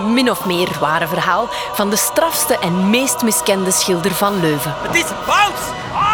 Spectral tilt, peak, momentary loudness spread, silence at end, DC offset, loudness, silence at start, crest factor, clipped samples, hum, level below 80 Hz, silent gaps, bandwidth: -3 dB/octave; -2 dBFS; 4 LU; 0 s; under 0.1%; -16 LUFS; 0 s; 14 dB; under 0.1%; none; -46 dBFS; none; over 20 kHz